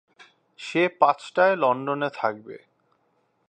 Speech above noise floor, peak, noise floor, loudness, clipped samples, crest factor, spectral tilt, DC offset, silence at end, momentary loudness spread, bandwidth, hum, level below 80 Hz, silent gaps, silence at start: 46 dB; -2 dBFS; -69 dBFS; -23 LUFS; under 0.1%; 22 dB; -5.5 dB/octave; under 0.1%; 0.9 s; 18 LU; 9.2 kHz; none; -80 dBFS; none; 0.6 s